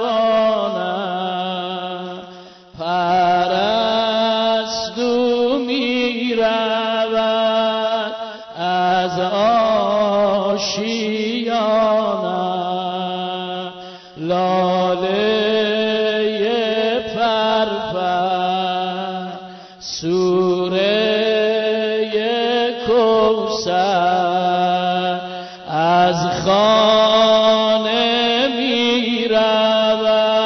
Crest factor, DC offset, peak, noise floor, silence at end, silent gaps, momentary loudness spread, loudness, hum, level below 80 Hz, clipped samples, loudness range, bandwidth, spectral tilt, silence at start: 12 dB; under 0.1%; -4 dBFS; -39 dBFS; 0 s; none; 10 LU; -17 LUFS; none; -54 dBFS; under 0.1%; 5 LU; 6.4 kHz; -4.5 dB/octave; 0 s